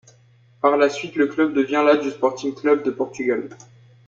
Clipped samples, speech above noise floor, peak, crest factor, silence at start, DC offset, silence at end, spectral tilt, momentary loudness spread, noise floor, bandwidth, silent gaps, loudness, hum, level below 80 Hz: under 0.1%; 34 dB; -4 dBFS; 18 dB; 0.65 s; under 0.1%; 0.5 s; -5 dB/octave; 7 LU; -54 dBFS; 7.6 kHz; none; -20 LUFS; none; -68 dBFS